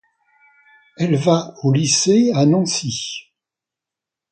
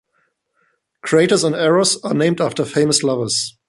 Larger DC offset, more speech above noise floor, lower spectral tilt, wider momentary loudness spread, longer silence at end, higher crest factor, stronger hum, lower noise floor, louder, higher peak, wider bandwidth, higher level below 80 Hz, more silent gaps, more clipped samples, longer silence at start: neither; first, 70 dB vs 50 dB; about the same, -5 dB/octave vs -4 dB/octave; first, 11 LU vs 5 LU; first, 1.1 s vs 0.2 s; about the same, 18 dB vs 16 dB; neither; first, -87 dBFS vs -66 dBFS; about the same, -17 LUFS vs -16 LUFS; about the same, 0 dBFS vs -2 dBFS; second, 9.4 kHz vs 11.5 kHz; about the same, -60 dBFS vs -60 dBFS; neither; neither; about the same, 1 s vs 1.05 s